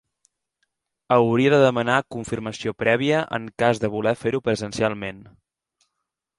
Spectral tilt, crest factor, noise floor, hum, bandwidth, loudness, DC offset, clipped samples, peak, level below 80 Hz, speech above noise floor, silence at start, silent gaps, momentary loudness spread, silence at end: -6 dB/octave; 20 dB; -81 dBFS; none; 11.5 kHz; -22 LUFS; under 0.1%; under 0.1%; -2 dBFS; -56 dBFS; 60 dB; 1.1 s; none; 12 LU; 1.15 s